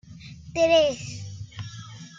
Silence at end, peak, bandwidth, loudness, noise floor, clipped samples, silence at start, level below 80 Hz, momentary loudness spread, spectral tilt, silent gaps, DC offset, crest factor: 0 s; -8 dBFS; 7.8 kHz; -22 LUFS; -43 dBFS; under 0.1%; 0.05 s; -54 dBFS; 22 LU; -4 dB/octave; none; under 0.1%; 18 dB